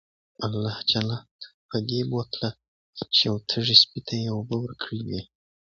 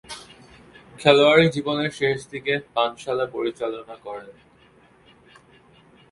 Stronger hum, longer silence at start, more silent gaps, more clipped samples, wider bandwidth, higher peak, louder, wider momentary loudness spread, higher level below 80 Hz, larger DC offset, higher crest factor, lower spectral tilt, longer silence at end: neither; first, 0.4 s vs 0.1 s; first, 1.31-1.39 s, 1.54-1.69 s, 2.68-2.93 s vs none; neither; second, 7.6 kHz vs 11.5 kHz; about the same, 0 dBFS vs 0 dBFS; second, -24 LUFS vs -21 LUFS; about the same, 19 LU vs 21 LU; about the same, -58 dBFS vs -60 dBFS; neither; about the same, 26 dB vs 24 dB; about the same, -5 dB/octave vs -5 dB/octave; second, 0.5 s vs 1.8 s